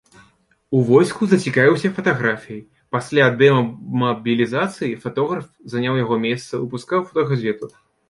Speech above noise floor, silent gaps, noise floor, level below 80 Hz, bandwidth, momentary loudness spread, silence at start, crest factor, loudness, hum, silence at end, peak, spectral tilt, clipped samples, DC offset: 39 dB; none; -58 dBFS; -60 dBFS; 11.5 kHz; 12 LU; 0.7 s; 18 dB; -19 LUFS; none; 0.4 s; -2 dBFS; -6.5 dB/octave; under 0.1%; under 0.1%